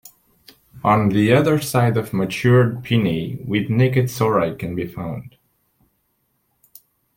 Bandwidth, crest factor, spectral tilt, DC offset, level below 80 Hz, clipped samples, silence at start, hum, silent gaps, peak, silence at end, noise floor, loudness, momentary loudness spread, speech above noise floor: 17 kHz; 16 dB; -7 dB/octave; under 0.1%; -52 dBFS; under 0.1%; 0.75 s; none; none; -4 dBFS; 1.9 s; -68 dBFS; -19 LUFS; 11 LU; 50 dB